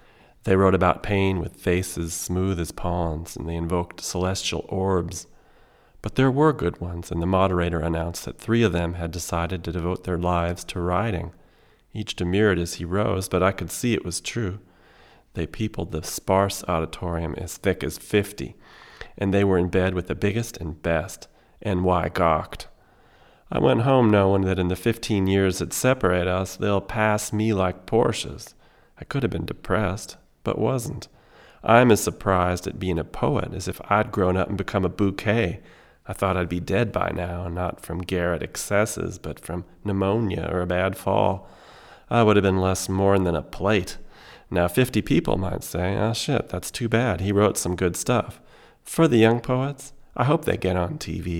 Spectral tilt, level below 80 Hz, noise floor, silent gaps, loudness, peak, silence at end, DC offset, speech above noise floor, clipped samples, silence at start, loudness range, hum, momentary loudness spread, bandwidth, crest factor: -5.5 dB/octave; -42 dBFS; -56 dBFS; none; -24 LUFS; -2 dBFS; 0 s; under 0.1%; 33 dB; under 0.1%; 0.45 s; 5 LU; none; 12 LU; 17.5 kHz; 22 dB